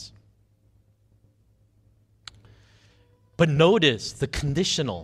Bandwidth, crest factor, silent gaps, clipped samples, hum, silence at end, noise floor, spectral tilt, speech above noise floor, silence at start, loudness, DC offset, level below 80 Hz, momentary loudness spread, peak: 13 kHz; 22 dB; none; under 0.1%; none; 0 s; -62 dBFS; -5 dB/octave; 40 dB; 0 s; -22 LUFS; under 0.1%; -48 dBFS; 28 LU; -4 dBFS